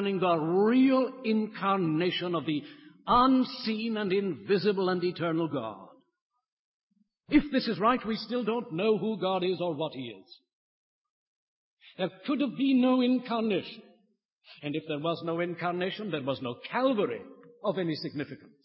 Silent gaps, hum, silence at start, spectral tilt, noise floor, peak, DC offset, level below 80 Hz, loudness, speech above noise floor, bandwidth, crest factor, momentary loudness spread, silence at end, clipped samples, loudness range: 6.22-6.30 s, 6.52-6.90 s, 10.53-11.77 s, 14.25-14.38 s; none; 0 s; -10 dB/octave; -71 dBFS; -10 dBFS; under 0.1%; -62 dBFS; -29 LUFS; 42 dB; 5.8 kHz; 18 dB; 12 LU; 0.3 s; under 0.1%; 6 LU